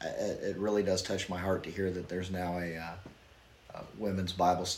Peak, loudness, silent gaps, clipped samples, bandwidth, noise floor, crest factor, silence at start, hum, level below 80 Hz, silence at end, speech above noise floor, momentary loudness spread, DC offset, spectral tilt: -16 dBFS; -34 LUFS; none; under 0.1%; 16.5 kHz; -59 dBFS; 18 dB; 0 s; none; -60 dBFS; 0 s; 25 dB; 17 LU; under 0.1%; -4.5 dB/octave